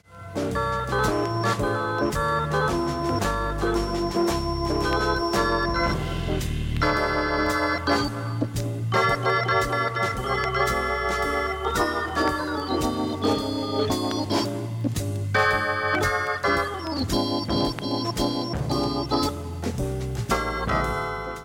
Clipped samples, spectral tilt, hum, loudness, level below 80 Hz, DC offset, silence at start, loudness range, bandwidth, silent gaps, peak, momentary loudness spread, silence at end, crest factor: under 0.1%; -5 dB/octave; none; -25 LUFS; -36 dBFS; under 0.1%; 0.1 s; 2 LU; 17.5 kHz; none; -8 dBFS; 6 LU; 0 s; 16 dB